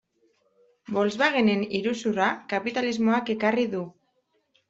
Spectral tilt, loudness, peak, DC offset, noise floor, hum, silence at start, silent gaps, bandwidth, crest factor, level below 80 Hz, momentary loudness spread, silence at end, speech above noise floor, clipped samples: -5.5 dB/octave; -25 LUFS; -8 dBFS; under 0.1%; -71 dBFS; none; 0.9 s; none; 7.8 kHz; 18 dB; -68 dBFS; 7 LU; 0.8 s; 47 dB; under 0.1%